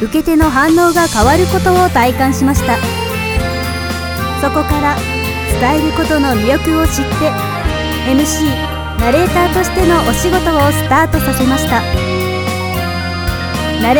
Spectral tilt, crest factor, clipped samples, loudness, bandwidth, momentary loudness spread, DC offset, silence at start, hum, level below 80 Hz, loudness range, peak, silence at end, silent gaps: -5 dB/octave; 12 dB; under 0.1%; -13 LUFS; over 20 kHz; 7 LU; under 0.1%; 0 s; none; -24 dBFS; 3 LU; -2 dBFS; 0 s; none